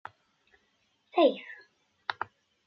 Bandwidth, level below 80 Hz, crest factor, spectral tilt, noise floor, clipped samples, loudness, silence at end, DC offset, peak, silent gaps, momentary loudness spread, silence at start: 6.4 kHz; -86 dBFS; 22 dB; -1.5 dB/octave; -73 dBFS; under 0.1%; -30 LUFS; 0.55 s; under 0.1%; -12 dBFS; none; 23 LU; 1.15 s